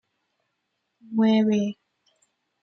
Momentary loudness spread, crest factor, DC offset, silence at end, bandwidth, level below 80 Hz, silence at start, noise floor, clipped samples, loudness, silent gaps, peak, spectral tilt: 13 LU; 16 dB; under 0.1%; 0.9 s; 6.6 kHz; -74 dBFS; 1.1 s; -78 dBFS; under 0.1%; -23 LUFS; none; -10 dBFS; -7 dB/octave